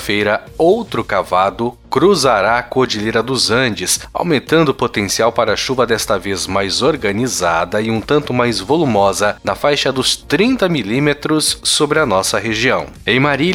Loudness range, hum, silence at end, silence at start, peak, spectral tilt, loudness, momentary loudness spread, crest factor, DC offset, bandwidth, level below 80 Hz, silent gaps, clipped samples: 1 LU; none; 0 s; 0 s; 0 dBFS; -3.5 dB/octave; -15 LUFS; 4 LU; 14 dB; under 0.1%; 16.5 kHz; -42 dBFS; none; under 0.1%